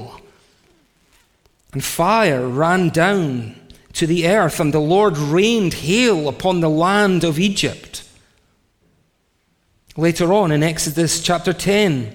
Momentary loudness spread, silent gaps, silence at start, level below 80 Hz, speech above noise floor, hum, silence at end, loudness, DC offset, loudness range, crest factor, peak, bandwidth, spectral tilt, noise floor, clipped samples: 11 LU; none; 0 s; -46 dBFS; 47 dB; none; 0 s; -17 LUFS; under 0.1%; 6 LU; 16 dB; -2 dBFS; 18 kHz; -5 dB/octave; -64 dBFS; under 0.1%